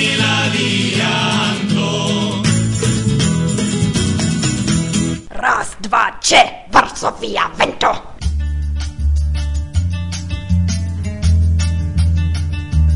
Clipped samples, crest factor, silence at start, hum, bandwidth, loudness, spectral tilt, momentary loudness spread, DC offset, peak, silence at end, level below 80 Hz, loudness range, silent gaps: under 0.1%; 16 dB; 0 s; none; 11 kHz; -16 LUFS; -4.5 dB/octave; 8 LU; under 0.1%; 0 dBFS; 0 s; -26 dBFS; 4 LU; none